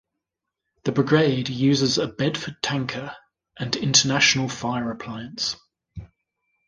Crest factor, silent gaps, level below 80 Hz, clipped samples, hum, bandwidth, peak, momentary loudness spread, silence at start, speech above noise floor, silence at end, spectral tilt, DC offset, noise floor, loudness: 22 dB; none; -56 dBFS; under 0.1%; none; 10 kHz; -2 dBFS; 16 LU; 0.85 s; 61 dB; 0.6 s; -3.5 dB/octave; under 0.1%; -84 dBFS; -22 LUFS